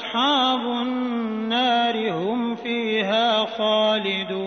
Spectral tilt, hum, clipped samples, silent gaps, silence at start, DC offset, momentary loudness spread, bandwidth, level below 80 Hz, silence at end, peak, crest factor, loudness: -5 dB/octave; none; under 0.1%; none; 0 s; under 0.1%; 6 LU; 6.6 kHz; -72 dBFS; 0 s; -10 dBFS; 14 dB; -22 LUFS